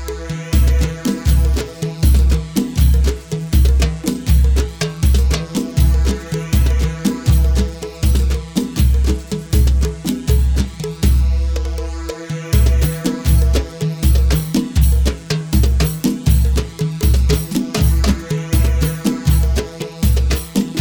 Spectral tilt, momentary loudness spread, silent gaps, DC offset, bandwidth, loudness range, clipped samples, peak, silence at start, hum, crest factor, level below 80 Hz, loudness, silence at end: -6 dB/octave; 7 LU; none; under 0.1%; 20 kHz; 1 LU; under 0.1%; -2 dBFS; 0 s; none; 14 dB; -16 dBFS; -17 LUFS; 0 s